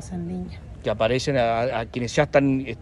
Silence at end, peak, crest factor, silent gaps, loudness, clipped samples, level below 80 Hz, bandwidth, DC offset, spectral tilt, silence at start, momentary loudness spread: 0 s; -4 dBFS; 18 dB; none; -23 LUFS; under 0.1%; -44 dBFS; 11.5 kHz; under 0.1%; -6 dB/octave; 0 s; 12 LU